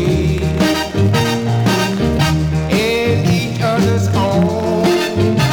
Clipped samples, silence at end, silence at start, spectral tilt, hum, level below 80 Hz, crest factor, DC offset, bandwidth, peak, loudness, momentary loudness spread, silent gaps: under 0.1%; 0 s; 0 s; -6 dB/octave; none; -32 dBFS; 12 dB; under 0.1%; over 20 kHz; -2 dBFS; -15 LUFS; 2 LU; none